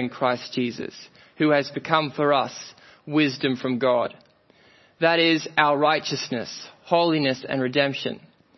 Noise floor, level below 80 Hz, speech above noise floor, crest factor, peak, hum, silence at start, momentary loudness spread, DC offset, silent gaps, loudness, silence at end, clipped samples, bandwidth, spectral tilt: -57 dBFS; -70 dBFS; 34 dB; 22 dB; -2 dBFS; none; 0 s; 15 LU; under 0.1%; none; -23 LUFS; 0.4 s; under 0.1%; 6.2 kHz; -5 dB/octave